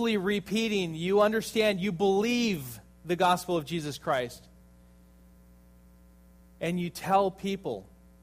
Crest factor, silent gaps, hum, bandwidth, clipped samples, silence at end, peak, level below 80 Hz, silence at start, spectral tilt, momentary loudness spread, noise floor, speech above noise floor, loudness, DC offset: 18 dB; none; 60 Hz at -55 dBFS; 15.5 kHz; under 0.1%; 0.4 s; -10 dBFS; -58 dBFS; 0 s; -5 dB/octave; 11 LU; -56 dBFS; 28 dB; -28 LUFS; under 0.1%